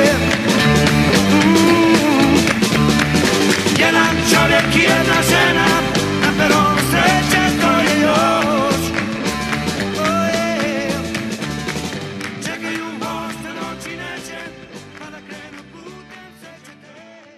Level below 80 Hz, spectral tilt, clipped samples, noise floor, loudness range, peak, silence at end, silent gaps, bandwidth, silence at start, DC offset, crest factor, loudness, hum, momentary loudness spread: -38 dBFS; -4 dB/octave; under 0.1%; -42 dBFS; 16 LU; 0 dBFS; 0.35 s; none; 15.5 kHz; 0 s; under 0.1%; 16 dB; -15 LUFS; none; 15 LU